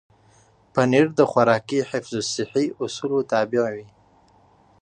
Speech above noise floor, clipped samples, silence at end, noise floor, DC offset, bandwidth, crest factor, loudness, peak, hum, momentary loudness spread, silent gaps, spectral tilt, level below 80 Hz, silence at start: 35 dB; under 0.1%; 1 s; -56 dBFS; under 0.1%; 9.8 kHz; 20 dB; -22 LUFS; -4 dBFS; none; 9 LU; none; -5 dB/octave; -64 dBFS; 0.75 s